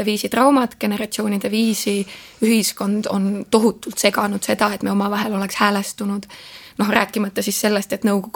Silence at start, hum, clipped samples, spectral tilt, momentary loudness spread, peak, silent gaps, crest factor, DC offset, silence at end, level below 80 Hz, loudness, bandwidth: 0 s; none; under 0.1%; -4 dB/octave; 7 LU; 0 dBFS; none; 20 dB; under 0.1%; 0.05 s; -58 dBFS; -19 LUFS; 19.5 kHz